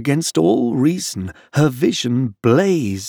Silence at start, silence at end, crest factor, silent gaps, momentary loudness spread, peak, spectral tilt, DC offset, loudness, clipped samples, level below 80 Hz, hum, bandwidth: 0 s; 0 s; 14 dB; none; 8 LU; -4 dBFS; -5.5 dB/octave; under 0.1%; -17 LUFS; under 0.1%; -54 dBFS; none; 19.5 kHz